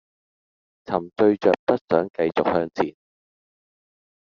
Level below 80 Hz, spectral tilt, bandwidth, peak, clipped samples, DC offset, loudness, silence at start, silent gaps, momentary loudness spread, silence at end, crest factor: -64 dBFS; -5 dB/octave; 7 kHz; -2 dBFS; under 0.1%; under 0.1%; -22 LUFS; 0.9 s; 1.59-1.67 s, 1.81-1.88 s, 2.10-2.14 s; 9 LU; 1.4 s; 22 dB